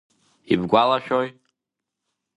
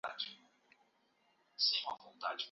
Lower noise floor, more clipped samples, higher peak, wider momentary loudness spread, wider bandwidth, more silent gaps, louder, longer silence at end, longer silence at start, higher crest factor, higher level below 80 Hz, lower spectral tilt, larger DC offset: first, -84 dBFS vs -75 dBFS; neither; first, -2 dBFS vs -20 dBFS; second, 7 LU vs 12 LU; first, 10.5 kHz vs 7.2 kHz; neither; first, -21 LUFS vs -37 LUFS; first, 1.05 s vs 0 s; first, 0.5 s vs 0.05 s; about the same, 22 dB vs 22 dB; first, -58 dBFS vs under -90 dBFS; first, -7 dB/octave vs 4 dB/octave; neither